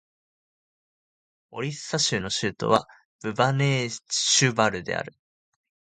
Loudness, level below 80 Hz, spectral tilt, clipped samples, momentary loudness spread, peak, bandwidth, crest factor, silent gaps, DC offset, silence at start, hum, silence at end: -24 LUFS; -60 dBFS; -3.5 dB/octave; under 0.1%; 14 LU; -4 dBFS; 10.5 kHz; 24 dB; 3.05-3.19 s; under 0.1%; 1.5 s; none; 0.85 s